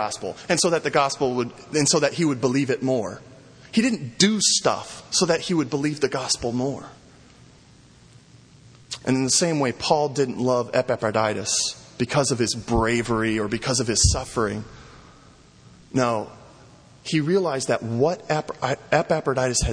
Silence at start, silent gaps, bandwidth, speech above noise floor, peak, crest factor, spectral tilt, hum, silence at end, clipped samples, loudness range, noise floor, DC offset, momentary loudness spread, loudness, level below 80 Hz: 0 s; none; 10.5 kHz; 29 dB; -2 dBFS; 20 dB; -3.5 dB/octave; none; 0 s; under 0.1%; 5 LU; -51 dBFS; under 0.1%; 9 LU; -22 LUFS; -42 dBFS